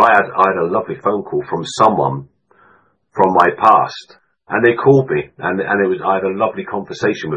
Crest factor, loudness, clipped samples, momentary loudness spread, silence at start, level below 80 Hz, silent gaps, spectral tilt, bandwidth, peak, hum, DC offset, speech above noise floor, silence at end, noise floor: 16 dB; -15 LUFS; under 0.1%; 11 LU; 0 s; -56 dBFS; none; -6 dB/octave; 9.8 kHz; 0 dBFS; none; under 0.1%; 38 dB; 0 s; -53 dBFS